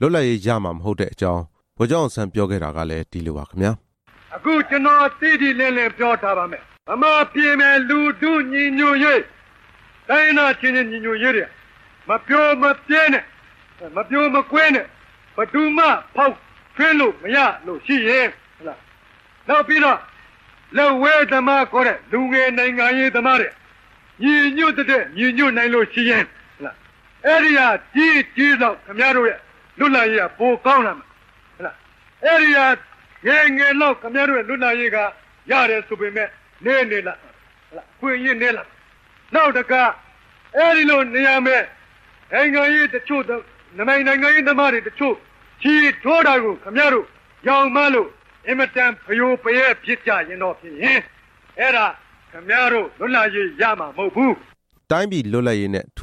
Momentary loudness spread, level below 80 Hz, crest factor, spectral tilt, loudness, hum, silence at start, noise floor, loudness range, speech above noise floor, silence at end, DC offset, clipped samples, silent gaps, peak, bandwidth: 13 LU; -52 dBFS; 14 dB; -5.5 dB/octave; -17 LUFS; none; 0 s; -51 dBFS; 4 LU; 34 dB; 0 s; under 0.1%; under 0.1%; none; -4 dBFS; 10.5 kHz